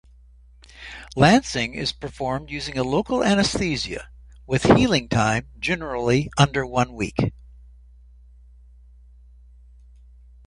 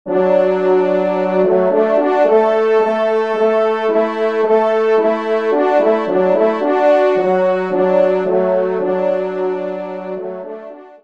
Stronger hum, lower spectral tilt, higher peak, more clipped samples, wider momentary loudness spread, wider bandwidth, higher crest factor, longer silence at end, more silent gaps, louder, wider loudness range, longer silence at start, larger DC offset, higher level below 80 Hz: neither; second, -5 dB/octave vs -7.5 dB/octave; about the same, 0 dBFS vs 0 dBFS; neither; first, 13 LU vs 10 LU; first, 11.5 kHz vs 7.4 kHz; first, 24 dB vs 14 dB; first, 3.15 s vs 0.15 s; neither; second, -22 LUFS vs -15 LUFS; first, 8 LU vs 3 LU; first, 0.8 s vs 0.05 s; second, under 0.1% vs 0.4%; first, -42 dBFS vs -66 dBFS